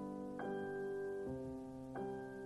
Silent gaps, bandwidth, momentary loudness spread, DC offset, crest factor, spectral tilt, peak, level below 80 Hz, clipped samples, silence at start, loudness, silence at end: none; 12 kHz; 5 LU; under 0.1%; 12 dB; -7.5 dB/octave; -34 dBFS; -68 dBFS; under 0.1%; 0 s; -45 LUFS; 0 s